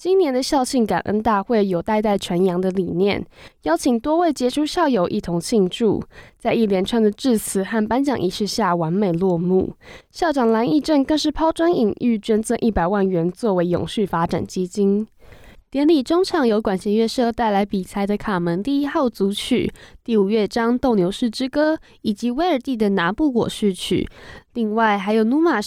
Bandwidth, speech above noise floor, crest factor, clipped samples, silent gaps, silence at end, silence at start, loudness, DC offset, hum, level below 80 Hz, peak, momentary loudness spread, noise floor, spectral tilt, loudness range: 15.5 kHz; 25 dB; 14 dB; under 0.1%; none; 0 s; 0 s; -20 LUFS; under 0.1%; none; -46 dBFS; -6 dBFS; 6 LU; -44 dBFS; -5.5 dB/octave; 2 LU